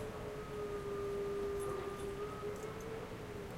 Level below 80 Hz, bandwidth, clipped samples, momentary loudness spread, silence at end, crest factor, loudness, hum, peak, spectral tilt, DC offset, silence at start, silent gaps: -56 dBFS; 16 kHz; under 0.1%; 6 LU; 0 s; 12 dB; -43 LUFS; none; -30 dBFS; -5.5 dB/octave; under 0.1%; 0 s; none